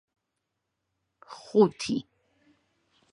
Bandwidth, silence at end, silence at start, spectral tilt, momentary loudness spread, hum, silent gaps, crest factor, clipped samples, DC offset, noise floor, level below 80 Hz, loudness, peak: 11 kHz; 1.1 s; 1.3 s; -6 dB/octave; 24 LU; none; none; 24 dB; under 0.1%; under 0.1%; -83 dBFS; -70 dBFS; -26 LUFS; -8 dBFS